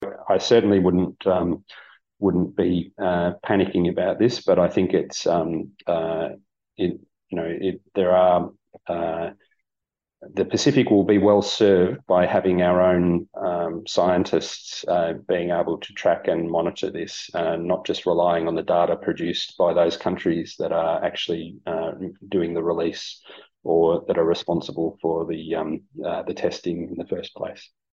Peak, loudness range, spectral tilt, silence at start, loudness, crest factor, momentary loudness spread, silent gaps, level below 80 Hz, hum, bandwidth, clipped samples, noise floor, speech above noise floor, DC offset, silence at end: -4 dBFS; 6 LU; -6 dB/octave; 0 s; -22 LUFS; 18 dB; 12 LU; none; -56 dBFS; none; 7.8 kHz; under 0.1%; -87 dBFS; 65 dB; under 0.1%; 0.3 s